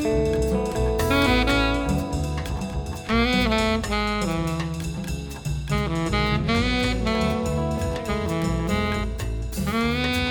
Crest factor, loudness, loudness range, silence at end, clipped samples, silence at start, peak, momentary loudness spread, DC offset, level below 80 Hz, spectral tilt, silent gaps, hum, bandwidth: 16 dB; -24 LUFS; 2 LU; 0 s; under 0.1%; 0 s; -8 dBFS; 9 LU; under 0.1%; -30 dBFS; -5.5 dB/octave; none; none; 19.5 kHz